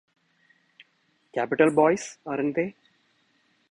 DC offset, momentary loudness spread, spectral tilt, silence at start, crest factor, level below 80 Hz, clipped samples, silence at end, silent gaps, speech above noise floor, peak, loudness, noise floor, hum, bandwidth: under 0.1%; 13 LU; -5.5 dB/octave; 1.35 s; 22 dB; -70 dBFS; under 0.1%; 1 s; none; 45 dB; -6 dBFS; -25 LUFS; -69 dBFS; none; 10.5 kHz